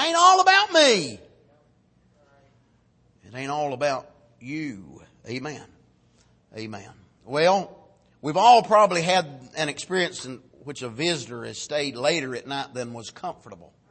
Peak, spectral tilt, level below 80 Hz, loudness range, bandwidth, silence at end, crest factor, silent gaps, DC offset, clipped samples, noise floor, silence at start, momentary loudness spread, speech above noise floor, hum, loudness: -4 dBFS; -3 dB/octave; -68 dBFS; 12 LU; 8.8 kHz; 0.35 s; 22 dB; none; under 0.1%; under 0.1%; -62 dBFS; 0 s; 23 LU; 37 dB; none; -22 LUFS